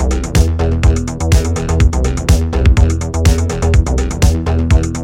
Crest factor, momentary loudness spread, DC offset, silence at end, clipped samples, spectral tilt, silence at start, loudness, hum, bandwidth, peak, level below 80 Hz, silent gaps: 12 dB; 3 LU; under 0.1%; 0 s; under 0.1%; -6 dB/octave; 0 s; -14 LUFS; none; 15.5 kHz; 0 dBFS; -14 dBFS; none